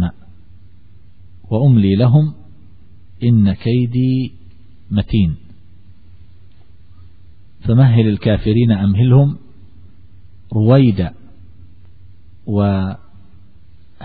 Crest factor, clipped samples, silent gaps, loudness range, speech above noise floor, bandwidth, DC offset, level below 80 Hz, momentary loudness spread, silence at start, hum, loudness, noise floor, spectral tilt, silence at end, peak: 16 dB; under 0.1%; none; 7 LU; 35 dB; 4.8 kHz; 2%; -38 dBFS; 13 LU; 0 s; none; -15 LUFS; -47 dBFS; -12.5 dB/octave; 0 s; 0 dBFS